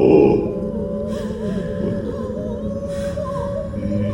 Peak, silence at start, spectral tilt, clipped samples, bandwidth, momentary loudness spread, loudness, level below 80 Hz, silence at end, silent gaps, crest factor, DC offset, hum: -2 dBFS; 0 s; -8.5 dB/octave; under 0.1%; 16 kHz; 10 LU; -22 LUFS; -36 dBFS; 0 s; none; 18 dB; under 0.1%; none